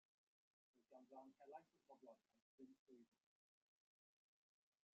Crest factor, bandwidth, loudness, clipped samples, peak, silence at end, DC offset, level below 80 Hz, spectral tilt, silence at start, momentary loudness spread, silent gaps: 24 dB; 5.4 kHz; -66 LUFS; under 0.1%; -46 dBFS; 1.85 s; under 0.1%; under -90 dBFS; -4.5 dB/octave; 0.75 s; 5 LU; 2.42-2.58 s, 2.79-2.86 s